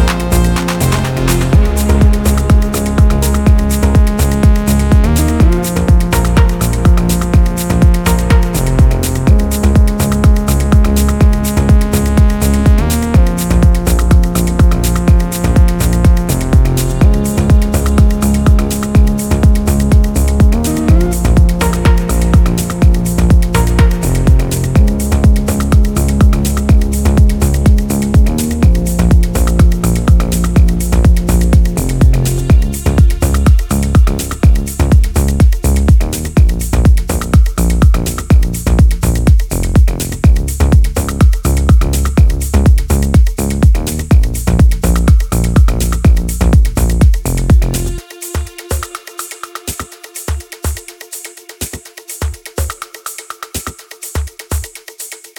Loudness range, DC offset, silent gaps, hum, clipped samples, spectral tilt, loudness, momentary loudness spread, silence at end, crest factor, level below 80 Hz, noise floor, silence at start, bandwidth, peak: 6 LU; under 0.1%; none; none; under 0.1%; -6 dB/octave; -12 LUFS; 11 LU; 0.2 s; 10 dB; -12 dBFS; -30 dBFS; 0 s; 19.5 kHz; 0 dBFS